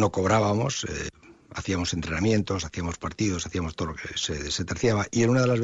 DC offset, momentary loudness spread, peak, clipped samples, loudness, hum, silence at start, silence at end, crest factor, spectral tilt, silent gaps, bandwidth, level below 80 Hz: under 0.1%; 10 LU; -10 dBFS; under 0.1%; -26 LUFS; none; 0 s; 0 s; 16 dB; -5 dB/octave; none; 8 kHz; -46 dBFS